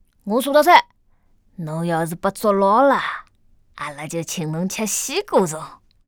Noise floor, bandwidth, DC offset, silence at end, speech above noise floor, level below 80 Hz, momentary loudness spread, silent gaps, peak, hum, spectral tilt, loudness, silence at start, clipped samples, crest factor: -57 dBFS; over 20 kHz; under 0.1%; 0.3 s; 39 dB; -56 dBFS; 18 LU; none; 0 dBFS; none; -4 dB/octave; -19 LUFS; 0.25 s; under 0.1%; 20 dB